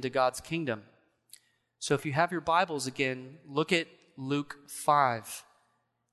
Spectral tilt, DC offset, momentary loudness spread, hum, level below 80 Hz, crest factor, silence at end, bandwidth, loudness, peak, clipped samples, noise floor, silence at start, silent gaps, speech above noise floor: -4.5 dB/octave; under 0.1%; 15 LU; none; -68 dBFS; 22 dB; 0.7 s; 12.5 kHz; -30 LUFS; -10 dBFS; under 0.1%; -75 dBFS; 0 s; none; 45 dB